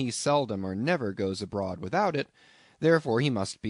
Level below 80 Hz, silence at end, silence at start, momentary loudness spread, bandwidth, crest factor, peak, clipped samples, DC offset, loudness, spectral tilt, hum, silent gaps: -64 dBFS; 0 s; 0 s; 8 LU; 11 kHz; 20 dB; -10 dBFS; under 0.1%; under 0.1%; -28 LUFS; -5.5 dB/octave; none; none